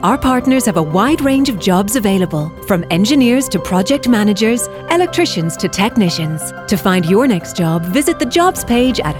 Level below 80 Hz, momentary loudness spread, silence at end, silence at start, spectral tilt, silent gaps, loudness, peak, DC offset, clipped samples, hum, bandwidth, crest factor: -38 dBFS; 5 LU; 0 s; 0 s; -5 dB/octave; none; -14 LUFS; 0 dBFS; under 0.1%; under 0.1%; none; 19 kHz; 14 dB